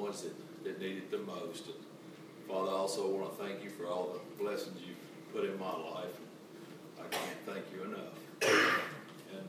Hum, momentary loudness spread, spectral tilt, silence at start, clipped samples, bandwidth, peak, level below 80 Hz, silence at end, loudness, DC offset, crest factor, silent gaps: none; 18 LU; -3.5 dB/octave; 0 s; under 0.1%; 16 kHz; -16 dBFS; under -90 dBFS; 0 s; -37 LUFS; under 0.1%; 22 dB; none